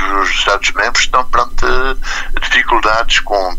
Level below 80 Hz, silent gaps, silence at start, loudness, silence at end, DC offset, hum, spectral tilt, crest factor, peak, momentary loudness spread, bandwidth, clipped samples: -20 dBFS; none; 0 s; -13 LUFS; 0 s; under 0.1%; none; -1.5 dB/octave; 12 dB; 0 dBFS; 7 LU; 8.2 kHz; under 0.1%